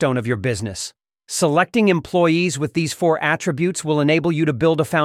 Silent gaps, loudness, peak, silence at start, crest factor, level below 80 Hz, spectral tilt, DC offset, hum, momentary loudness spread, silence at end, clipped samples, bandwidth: none; -19 LUFS; -4 dBFS; 0 s; 16 dB; -54 dBFS; -5 dB/octave; under 0.1%; none; 8 LU; 0 s; under 0.1%; 15.5 kHz